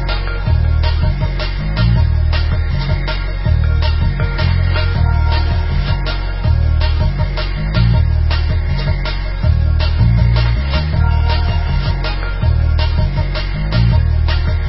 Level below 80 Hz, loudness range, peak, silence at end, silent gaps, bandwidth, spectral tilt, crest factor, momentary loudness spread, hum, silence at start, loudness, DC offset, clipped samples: -16 dBFS; 1 LU; -2 dBFS; 0 s; none; 5.8 kHz; -11 dB/octave; 12 dB; 6 LU; none; 0 s; -16 LUFS; under 0.1%; under 0.1%